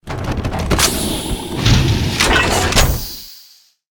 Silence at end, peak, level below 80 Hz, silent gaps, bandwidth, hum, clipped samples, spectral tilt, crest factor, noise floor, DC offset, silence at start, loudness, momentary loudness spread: 0.5 s; 0 dBFS; -24 dBFS; none; 19.5 kHz; none; under 0.1%; -3.5 dB/octave; 16 dB; -47 dBFS; under 0.1%; 0.05 s; -15 LUFS; 10 LU